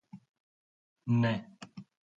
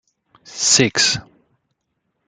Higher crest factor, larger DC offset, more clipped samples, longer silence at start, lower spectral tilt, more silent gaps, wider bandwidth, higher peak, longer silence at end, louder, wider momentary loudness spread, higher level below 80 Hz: about the same, 18 dB vs 20 dB; neither; neither; second, 0.15 s vs 0.5 s; first, -8 dB/octave vs -1.5 dB/octave; first, 0.29-0.34 s, 0.40-0.96 s vs none; second, 7.8 kHz vs 12 kHz; second, -18 dBFS vs -2 dBFS; second, 0.35 s vs 1.05 s; second, -31 LUFS vs -15 LUFS; first, 21 LU vs 13 LU; second, -70 dBFS vs -56 dBFS